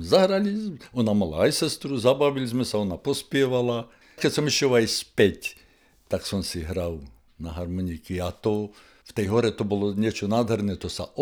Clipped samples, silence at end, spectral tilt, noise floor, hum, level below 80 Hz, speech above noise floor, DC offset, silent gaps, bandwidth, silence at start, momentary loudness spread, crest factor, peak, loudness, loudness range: under 0.1%; 0 s; -5 dB/octave; -58 dBFS; none; -50 dBFS; 34 dB; under 0.1%; none; over 20 kHz; 0 s; 11 LU; 20 dB; -6 dBFS; -25 LUFS; 7 LU